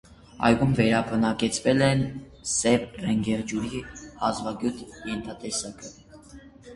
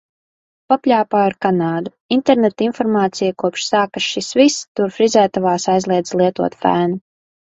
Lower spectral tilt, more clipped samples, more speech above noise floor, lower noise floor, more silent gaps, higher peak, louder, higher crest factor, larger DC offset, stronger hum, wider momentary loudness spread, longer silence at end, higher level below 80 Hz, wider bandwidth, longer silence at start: about the same, -5 dB/octave vs -5 dB/octave; neither; second, 23 dB vs over 74 dB; second, -48 dBFS vs under -90 dBFS; second, none vs 2.01-2.09 s, 4.68-4.75 s; second, -4 dBFS vs 0 dBFS; second, -25 LUFS vs -17 LUFS; first, 22 dB vs 16 dB; neither; neither; first, 14 LU vs 6 LU; second, 0 s vs 0.55 s; first, -50 dBFS vs -60 dBFS; first, 11.5 kHz vs 8.4 kHz; second, 0.1 s vs 0.7 s